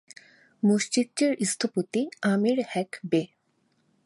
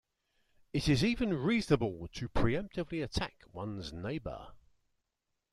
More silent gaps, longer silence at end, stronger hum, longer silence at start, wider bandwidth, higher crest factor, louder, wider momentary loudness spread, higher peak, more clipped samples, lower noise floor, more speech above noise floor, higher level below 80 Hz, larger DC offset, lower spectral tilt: neither; second, 0.8 s vs 0.95 s; neither; about the same, 0.65 s vs 0.75 s; second, 11.5 kHz vs 13 kHz; second, 16 dB vs 22 dB; first, -26 LUFS vs -34 LUFS; second, 6 LU vs 13 LU; about the same, -12 dBFS vs -12 dBFS; neither; second, -70 dBFS vs -85 dBFS; second, 45 dB vs 52 dB; second, -76 dBFS vs -48 dBFS; neither; second, -4.5 dB/octave vs -6 dB/octave